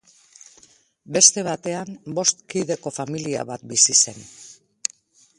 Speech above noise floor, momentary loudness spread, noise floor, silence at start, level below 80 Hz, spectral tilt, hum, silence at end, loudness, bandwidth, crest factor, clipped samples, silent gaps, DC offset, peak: 33 dB; 15 LU; -55 dBFS; 1.1 s; -66 dBFS; -1.5 dB/octave; none; 0.85 s; -20 LUFS; 11.5 kHz; 24 dB; under 0.1%; none; under 0.1%; 0 dBFS